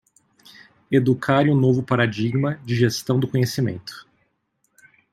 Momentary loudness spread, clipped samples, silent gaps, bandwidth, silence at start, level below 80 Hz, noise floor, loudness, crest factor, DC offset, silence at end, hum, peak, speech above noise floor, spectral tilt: 8 LU; under 0.1%; none; 15 kHz; 0.9 s; -60 dBFS; -70 dBFS; -21 LUFS; 18 dB; under 0.1%; 1.1 s; none; -2 dBFS; 50 dB; -6.5 dB/octave